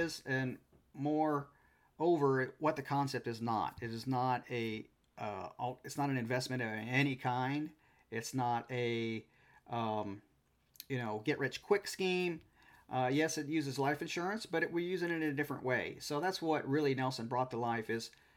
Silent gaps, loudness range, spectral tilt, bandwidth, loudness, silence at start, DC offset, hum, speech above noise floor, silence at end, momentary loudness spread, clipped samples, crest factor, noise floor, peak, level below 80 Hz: none; 3 LU; -5.5 dB/octave; 17 kHz; -37 LUFS; 0 s; under 0.1%; none; 35 dB; 0.25 s; 10 LU; under 0.1%; 20 dB; -71 dBFS; -18 dBFS; -74 dBFS